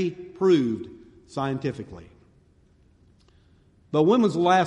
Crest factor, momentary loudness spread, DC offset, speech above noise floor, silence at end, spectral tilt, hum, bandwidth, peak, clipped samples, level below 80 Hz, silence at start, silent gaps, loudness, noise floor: 18 dB; 20 LU; under 0.1%; 36 dB; 0 s; -7 dB/octave; none; 10 kHz; -8 dBFS; under 0.1%; -60 dBFS; 0 s; none; -23 LUFS; -59 dBFS